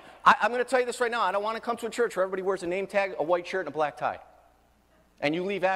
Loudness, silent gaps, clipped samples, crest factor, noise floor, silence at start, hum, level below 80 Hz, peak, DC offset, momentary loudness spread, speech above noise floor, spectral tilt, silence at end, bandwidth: -27 LUFS; none; under 0.1%; 24 dB; -63 dBFS; 0.05 s; none; -66 dBFS; -4 dBFS; under 0.1%; 9 LU; 36 dB; -4 dB/octave; 0 s; 15 kHz